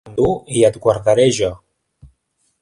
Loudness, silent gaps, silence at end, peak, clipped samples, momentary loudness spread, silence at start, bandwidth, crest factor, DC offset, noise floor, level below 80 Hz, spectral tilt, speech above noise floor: -16 LUFS; none; 1.05 s; 0 dBFS; under 0.1%; 6 LU; 0.05 s; 11.5 kHz; 18 dB; under 0.1%; -66 dBFS; -44 dBFS; -5 dB/octave; 51 dB